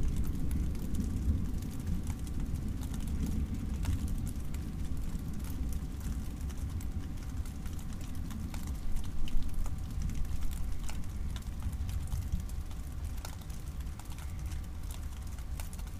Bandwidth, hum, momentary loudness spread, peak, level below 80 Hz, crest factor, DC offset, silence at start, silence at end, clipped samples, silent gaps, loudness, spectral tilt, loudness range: 16 kHz; none; 7 LU; -16 dBFS; -36 dBFS; 18 dB; under 0.1%; 0 s; 0 s; under 0.1%; none; -39 LUFS; -6 dB/octave; 4 LU